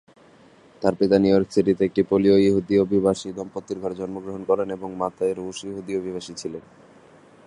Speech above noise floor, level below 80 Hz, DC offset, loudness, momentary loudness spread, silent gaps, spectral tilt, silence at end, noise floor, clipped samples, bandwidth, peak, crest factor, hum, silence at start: 30 dB; -54 dBFS; under 0.1%; -23 LUFS; 14 LU; none; -6.5 dB/octave; 0.85 s; -52 dBFS; under 0.1%; 11 kHz; -4 dBFS; 20 dB; none; 0.8 s